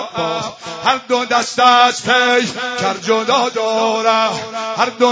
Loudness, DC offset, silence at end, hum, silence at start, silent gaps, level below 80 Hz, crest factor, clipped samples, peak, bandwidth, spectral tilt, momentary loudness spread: -15 LUFS; under 0.1%; 0 s; none; 0 s; none; -60 dBFS; 16 dB; under 0.1%; 0 dBFS; 8 kHz; -2.5 dB/octave; 9 LU